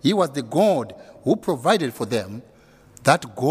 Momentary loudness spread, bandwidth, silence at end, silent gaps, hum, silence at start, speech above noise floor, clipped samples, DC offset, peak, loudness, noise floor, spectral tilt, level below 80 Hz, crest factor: 11 LU; 16 kHz; 0 s; none; none; 0.05 s; 29 dB; under 0.1%; under 0.1%; 0 dBFS; -22 LUFS; -50 dBFS; -5.5 dB/octave; -62 dBFS; 22 dB